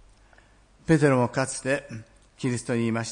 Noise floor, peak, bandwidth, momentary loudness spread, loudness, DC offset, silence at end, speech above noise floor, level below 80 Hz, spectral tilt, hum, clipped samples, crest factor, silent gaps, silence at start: -56 dBFS; -8 dBFS; 10.5 kHz; 18 LU; -25 LUFS; under 0.1%; 0 s; 32 dB; -56 dBFS; -6 dB/octave; none; under 0.1%; 18 dB; none; 0.9 s